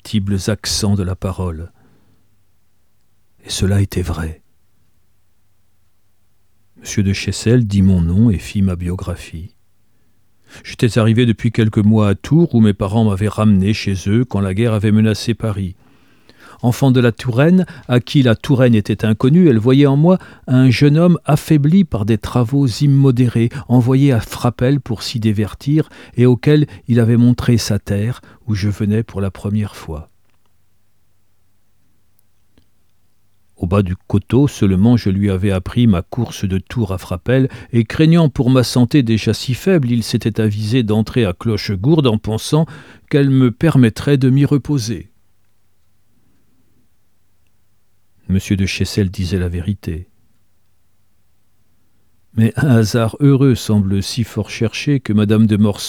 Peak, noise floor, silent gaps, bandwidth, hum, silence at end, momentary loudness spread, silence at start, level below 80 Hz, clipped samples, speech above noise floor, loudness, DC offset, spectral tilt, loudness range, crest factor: 0 dBFS; -64 dBFS; none; 16 kHz; none; 0 s; 10 LU; 0.05 s; -40 dBFS; under 0.1%; 50 dB; -15 LUFS; 0.3%; -7 dB/octave; 10 LU; 14 dB